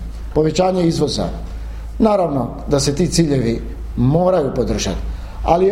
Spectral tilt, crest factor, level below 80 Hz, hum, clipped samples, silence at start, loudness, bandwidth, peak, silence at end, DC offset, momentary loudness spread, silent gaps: -6 dB/octave; 16 dB; -28 dBFS; none; under 0.1%; 0 s; -18 LUFS; 15.5 kHz; 0 dBFS; 0 s; under 0.1%; 12 LU; none